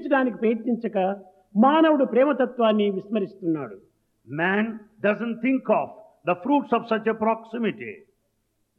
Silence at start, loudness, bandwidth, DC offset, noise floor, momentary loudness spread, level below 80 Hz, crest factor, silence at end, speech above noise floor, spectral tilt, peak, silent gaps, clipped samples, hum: 0 s; -23 LUFS; 4.7 kHz; under 0.1%; -72 dBFS; 11 LU; -74 dBFS; 16 dB; 0.8 s; 49 dB; -9 dB/octave; -6 dBFS; none; under 0.1%; none